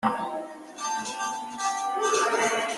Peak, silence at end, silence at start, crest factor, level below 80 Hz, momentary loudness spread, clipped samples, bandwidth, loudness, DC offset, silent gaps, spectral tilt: -10 dBFS; 0 s; 0 s; 18 dB; -72 dBFS; 11 LU; under 0.1%; 12.5 kHz; -27 LUFS; under 0.1%; none; -1.5 dB/octave